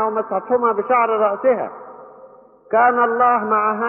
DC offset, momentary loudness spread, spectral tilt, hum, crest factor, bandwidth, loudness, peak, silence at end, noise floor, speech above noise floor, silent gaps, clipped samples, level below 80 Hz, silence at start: under 0.1%; 8 LU; -4 dB/octave; none; 14 dB; 3.2 kHz; -17 LUFS; -4 dBFS; 0 s; -45 dBFS; 28 dB; none; under 0.1%; -70 dBFS; 0 s